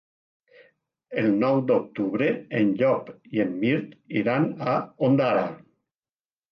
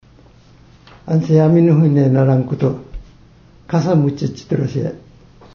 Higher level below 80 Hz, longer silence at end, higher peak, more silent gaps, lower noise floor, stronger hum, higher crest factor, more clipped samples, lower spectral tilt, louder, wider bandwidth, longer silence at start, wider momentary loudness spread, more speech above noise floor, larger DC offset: second, -70 dBFS vs -44 dBFS; first, 0.95 s vs 0.55 s; second, -10 dBFS vs -2 dBFS; neither; first, under -90 dBFS vs -46 dBFS; neither; about the same, 16 dB vs 14 dB; neither; about the same, -9.5 dB/octave vs -9.5 dB/octave; second, -24 LUFS vs -15 LUFS; second, 6 kHz vs 6.8 kHz; about the same, 1.1 s vs 1.05 s; second, 7 LU vs 14 LU; first, over 66 dB vs 32 dB; neither